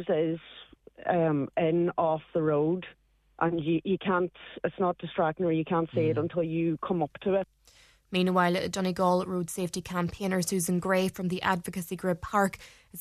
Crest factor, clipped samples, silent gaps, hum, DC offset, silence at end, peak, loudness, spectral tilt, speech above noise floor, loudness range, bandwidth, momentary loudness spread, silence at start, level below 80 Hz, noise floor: 18 dB; under 0.1%; none; none; under 0.1%; 0 s; -10 dBFS; -29 LUFS; -6 dB/octave; 31 dB; 1 LU; 14 kHz; 8 LU; 0 s; -60 dBFS; -60 dBFS